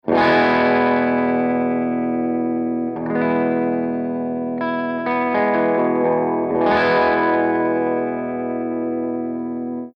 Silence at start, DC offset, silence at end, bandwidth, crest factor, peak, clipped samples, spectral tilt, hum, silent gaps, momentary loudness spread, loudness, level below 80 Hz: 0.05 s; under 0.1%; 0.1 s; 5.8 kHz; 14 dB; -6 dBFS; under 0.1%; -8 dB/octave; none; none; 8 LU; -19 LUFS; -58 dBFS